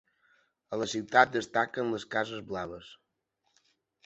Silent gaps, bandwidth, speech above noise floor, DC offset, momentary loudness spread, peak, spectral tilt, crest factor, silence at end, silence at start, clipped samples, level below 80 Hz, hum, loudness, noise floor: none; 8.2 kHz; 49 dB; under 0.1%; 14 LU; -6 dBFS; -4 dB/octave; 26 dB; 1.1 s; 0.7 s; under 0.1%; -68 dBFS; none; -30 LUFS; -79 dBFS